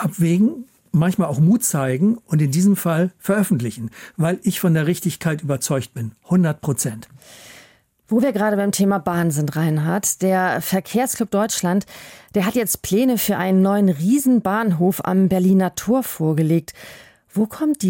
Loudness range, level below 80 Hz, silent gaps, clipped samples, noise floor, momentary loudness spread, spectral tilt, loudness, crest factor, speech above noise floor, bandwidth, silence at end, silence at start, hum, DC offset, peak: 4 LU; -56 dBFS; none; under 0.1%; -52 dBFS; 7 LU; -6 dB/octave; -19 LUFS; 14 dB; 34 dB; 17 kHz; 0 s; 0 s; none; under 0.1%; -6 dBFS